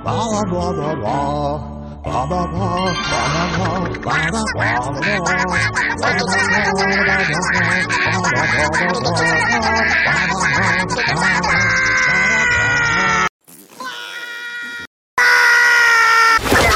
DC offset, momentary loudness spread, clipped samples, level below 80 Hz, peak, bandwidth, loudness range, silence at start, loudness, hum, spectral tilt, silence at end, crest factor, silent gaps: under 0.1%; 13 LU; under 0.1%; -36 dBFS; -4 dBFS; 16.5 kHz; 5 LU; 0 s; -15 LUFS; none; -3.5 dB/octave; 0 s; 12 dB; 13.29-13.39 s, 14.87-15.17 s